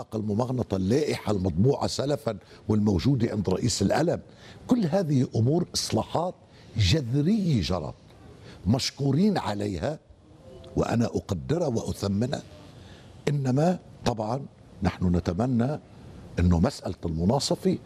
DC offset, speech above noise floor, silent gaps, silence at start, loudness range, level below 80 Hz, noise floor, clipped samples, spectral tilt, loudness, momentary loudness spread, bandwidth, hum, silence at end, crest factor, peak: under 0.1%; 25 dB; none; 0 s; 4 LU; -50 dBFS; -50 dBFS; under 0.1%; -6 dB/octave; -26 LUFS; 10 LU; 14.5 kHz; none; 0 s; 18 dB; -8 dBFS